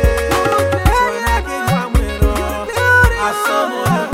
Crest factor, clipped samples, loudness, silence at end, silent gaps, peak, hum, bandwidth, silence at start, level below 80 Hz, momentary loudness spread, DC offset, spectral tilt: 14 dB; under 0.1%; -15 LUFS; 0 s; none; 0 dBFS; none; 17 kHz; 0 s; -20 dBFS; 6 LU; under 0.1%; -5 dB/octave